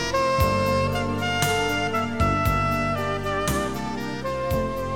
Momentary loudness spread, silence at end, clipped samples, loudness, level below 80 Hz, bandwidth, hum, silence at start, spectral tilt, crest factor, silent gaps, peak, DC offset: 7 LU; 0 s; under 0.1%; -24 LUFS; -36 dBFS; 18.5 kHz; none; 0 s; -5 dB/octave; 14 dB; none; -8 dBFS; 0.7%